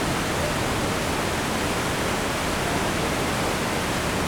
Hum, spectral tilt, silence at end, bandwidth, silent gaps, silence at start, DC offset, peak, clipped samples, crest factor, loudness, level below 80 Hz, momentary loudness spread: none; -4 dB/octave; 0 s; over 20 kHz; none; 0 s; under 0.1%; -12 dBFS; under 0.1%; 14 dB; -24 LUFS; -38 dBFS; 1 LU